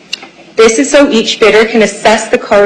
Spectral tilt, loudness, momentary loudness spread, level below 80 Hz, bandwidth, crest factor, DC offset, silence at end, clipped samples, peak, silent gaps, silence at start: -3 dB/octave; -8 LUFS; 11 LU; -42 dBFS; 11 kHz; 8 dB; under 0.1%; 0 s; 0.2%; 0 dBFS; none; 0.1 s